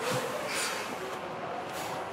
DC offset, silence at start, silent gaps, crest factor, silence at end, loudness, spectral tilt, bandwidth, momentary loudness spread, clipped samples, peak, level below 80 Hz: under 0.1%; 0 s; none; 16 dB; 0 s; -34 LUFS; -2.5 dB/octave; 16 kHz; 6 LU; under 0.1%; -18 dBFS; -70 dBFS